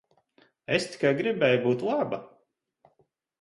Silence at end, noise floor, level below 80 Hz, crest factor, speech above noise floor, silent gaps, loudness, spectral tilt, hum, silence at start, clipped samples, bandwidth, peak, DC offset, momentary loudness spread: 1.15 s; -70 dBFS; -70 dBFS; 20 dB; 44 dB; none; -26 LUFS; -5.5 dB/octave; none; 0.7 s; under 0.1%; 11.5 kHz; -8 dBFS; under 0.1%; 10 LU